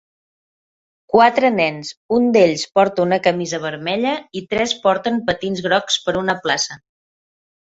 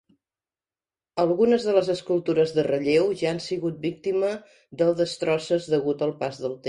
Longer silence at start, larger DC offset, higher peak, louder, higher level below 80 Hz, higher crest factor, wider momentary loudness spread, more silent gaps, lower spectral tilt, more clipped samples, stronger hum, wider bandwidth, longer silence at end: about the same, 1.15 s vs 1.15 s; neither; first, 0 dBFS vs -8 dBFS; first, -18 LUFS vs -24 LUFS; first, -56 dBFS vs -64 dBFS; about the same, 18 dB vs 18 dB; about the same, 9 LU vs 8 LU; first, 1.97-2.09 s vs none; second, -4 dB/octave vs -6 dB/octave; neither; neither; second, 8 kHz vs 11.5 kHz; first, 1 s vs 0 s